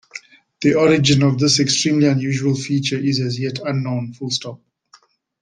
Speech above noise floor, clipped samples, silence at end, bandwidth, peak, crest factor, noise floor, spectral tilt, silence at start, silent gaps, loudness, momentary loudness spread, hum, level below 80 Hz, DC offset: 36 dB; under 0.1%; 0.85 s; 10 kHz; -2 dBFS; 16 dB; -53 dBFS; -5 dB/octave; 0.15 s; none; -18 LUFS; 10 LU; none; -56 dBFS; under 0.1%